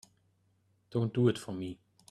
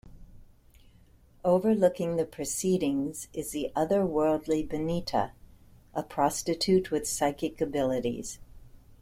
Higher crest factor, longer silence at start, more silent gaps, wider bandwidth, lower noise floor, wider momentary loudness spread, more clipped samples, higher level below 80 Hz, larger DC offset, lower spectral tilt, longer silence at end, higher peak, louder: about the same, 20 dB vs 20 dB; first, 0.9 s vs 0.05 s; neither; second, 12 kHz vs 16.5 kHz; first, -72 dBFS vs -58 dBFS; first, 14 LU vs 10 LU; neither; second, -70 dBFS vs -52 dBFS; neither; first, -7.5 dB/octave vs -5 dB/octave; first, 0.35 s vs 0.1 s; second, -14 dBFS vs -10 dBFS; second, -33 LUFS vs -29 LUFS